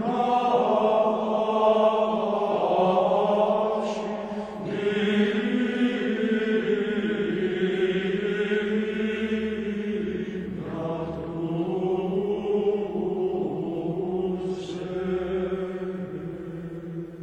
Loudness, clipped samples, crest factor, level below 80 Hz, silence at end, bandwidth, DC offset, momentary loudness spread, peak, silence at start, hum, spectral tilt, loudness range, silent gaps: -26 LUFS; under 0.1%; 16 dB; -56 dBFS; 0 s; 9 kHz; under 0.1%; 10 LU; -10 dBFS; 0 s; none; -7 dB/octave; 6 LU; none